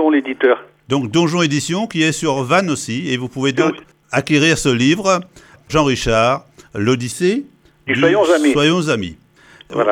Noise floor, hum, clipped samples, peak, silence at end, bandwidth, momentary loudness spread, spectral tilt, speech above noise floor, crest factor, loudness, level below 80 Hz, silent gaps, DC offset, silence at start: -44 dBFS; none; under 0.1%; -2 dBFS; 0 s; 16 kHz; 8 LU; -5 dB/octave; 28 dB; 16 dB; -16 LUFS; -42 dBFS; none; under 0.1%; 0 s